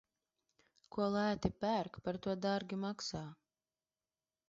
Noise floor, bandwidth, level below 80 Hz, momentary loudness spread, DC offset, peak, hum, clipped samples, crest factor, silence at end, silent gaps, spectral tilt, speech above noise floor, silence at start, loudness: under -90 dBFS; 7.6 kHz; -64 dBFS; 10 LU; under 0.1%; -20 dBFS; none; under 0.1%; 20 dB; 1.15 s; none; -5 dB/octave; over 52 dB; 0.95 s; -39 LUFS